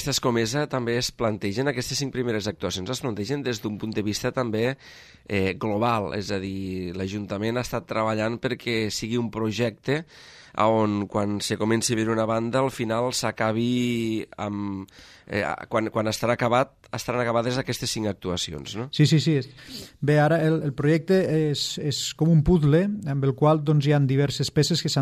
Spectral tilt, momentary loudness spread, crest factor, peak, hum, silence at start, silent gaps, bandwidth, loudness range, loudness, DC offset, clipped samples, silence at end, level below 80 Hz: -5.5 dB/octave; 9 LU; 16 dB; -8 dBFS; none; 0 s; none; 15 kHz; 6 LU; -25 LUFS; under 0.1%; under 0.1%; 0 s; -48 dBFS